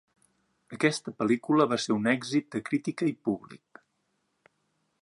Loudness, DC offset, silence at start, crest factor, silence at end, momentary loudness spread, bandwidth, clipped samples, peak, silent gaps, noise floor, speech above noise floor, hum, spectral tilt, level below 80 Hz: -28 LUFS; under 0.1%; 0.7 s; 20 dB; 1.5 s; 8 LU; 11.5 kHz; under 0.1%; -10 dBFS; none; -76 dBFS; 49 dB; none; -5 dB/octave; -74 dBFS